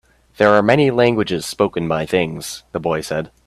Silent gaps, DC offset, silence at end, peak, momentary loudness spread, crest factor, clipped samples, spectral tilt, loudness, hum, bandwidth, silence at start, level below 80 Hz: none; under 0.1%; 0.2 s; 0 dBFS; 11 LU; 18 dB; under 0.1%; -5.5 dB/octave; -17 LUFS; none; 14.5 kHz; 0.4 s; -50 dBFS